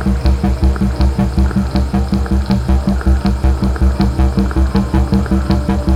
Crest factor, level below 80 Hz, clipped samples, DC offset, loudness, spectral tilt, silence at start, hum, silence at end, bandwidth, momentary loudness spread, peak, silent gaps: 12 dB; -16 dBFS; under 0.1%; under 0.1%; -15 LUFS; -8 dB/octave; 0 s; none; 0 s; 10.5 kHz; 2 LU; 0 dBFS; none